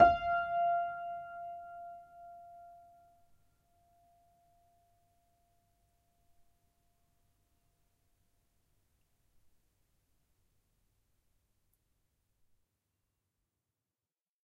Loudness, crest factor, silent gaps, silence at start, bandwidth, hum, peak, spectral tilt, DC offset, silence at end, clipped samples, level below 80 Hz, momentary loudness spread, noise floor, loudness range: -34 LUFS; 30 dB; none; 0 s; 5.2 kHz; none; -10 dBFS; -6.5 dB/octave; under 0.1%; 11.9 s; under 0.1%; -66 dBFS; 22 LU; under -90 dBFS; 23 LU